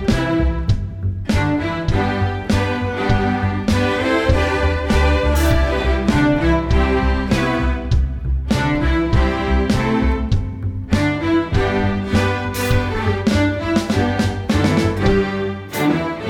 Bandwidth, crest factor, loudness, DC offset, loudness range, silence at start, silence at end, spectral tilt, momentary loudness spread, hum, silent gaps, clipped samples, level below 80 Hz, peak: 17.5 kHz; 14 dB; -18 LUFS; under 0.1%; 2 LU; 0 s; 0 s; -6.5 dB/octave; 5 LU; none; none; under 0.1%; -24 dBFS; -2 dBFS